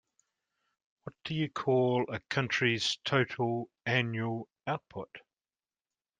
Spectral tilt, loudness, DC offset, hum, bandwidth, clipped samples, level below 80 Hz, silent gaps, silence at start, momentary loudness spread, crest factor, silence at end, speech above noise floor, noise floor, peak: -5 dB/octave; -31 LUFS; under 0.1%; none; 9.6 kHz; under 0.1%; -72 dBFS; none; 1.05 s; 16 LU; 22 dB; 1 s; over 58 dB; under -90 dBFS; -12 dBFS